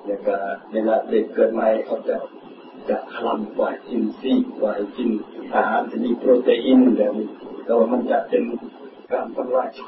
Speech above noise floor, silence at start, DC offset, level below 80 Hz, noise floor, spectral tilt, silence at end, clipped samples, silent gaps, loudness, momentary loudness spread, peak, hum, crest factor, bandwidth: 20 dB; 0 s; under 0.1%; -68 dBFS; -40 dBFS; -10.5 dB/octave; 0 s; under 0.1%; none; -21 LUFS; 12 LU; -4 dBFS; none; 16 dB; 5.2 kHz